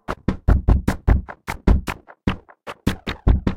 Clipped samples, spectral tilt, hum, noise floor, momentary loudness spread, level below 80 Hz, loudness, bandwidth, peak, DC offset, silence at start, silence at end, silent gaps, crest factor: under 0.1%; -7.5 dB/octave; none; -39 dBFS; 12 LU; -22 dBFS; -23 LUFS; 14.5 kHz; -2 dBFS; under 0.1%; 0.1 s; 0 s; none; 18 dB